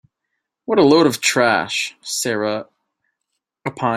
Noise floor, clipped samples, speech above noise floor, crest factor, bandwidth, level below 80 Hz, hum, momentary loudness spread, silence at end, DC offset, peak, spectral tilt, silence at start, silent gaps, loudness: -78 dBFS; under 0.1%; 60 dB; 18 dB; 16 kHz; -62 dBFS; none; 16 LU; 0 s; under 0.1%; -2 dBFS; -3.5 dB/octave; 0.7 s; none; -17 LUFS